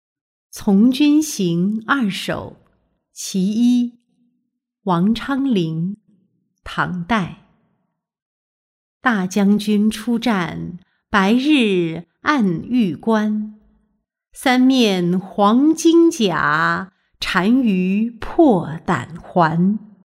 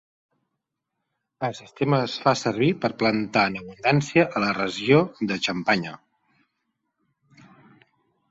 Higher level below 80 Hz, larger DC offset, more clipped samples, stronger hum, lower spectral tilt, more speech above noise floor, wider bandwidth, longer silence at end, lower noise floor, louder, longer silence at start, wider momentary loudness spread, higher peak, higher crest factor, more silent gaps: first, -50 dBFS vs -62 dBFS; neither; neither; neither; about the same, -5.5 dB/octave vs -5.5 dB/octave; about the same, 56 dB vs 59 dB; first, 15.5 kHz vs 8 kHz; second, 0.2 s vs 2.35 s; second, -73 dBFS vs -82 dBFS; first, -18 LUFS vs -23 LUFS; second, 0.55 s vs 1.4 s; first, 12 LU vs 9 LU; about the same, -2 dBFS vs -4 dBFS; second, 16 dB vs 22 dB; first, 8.22-9.01 s vs none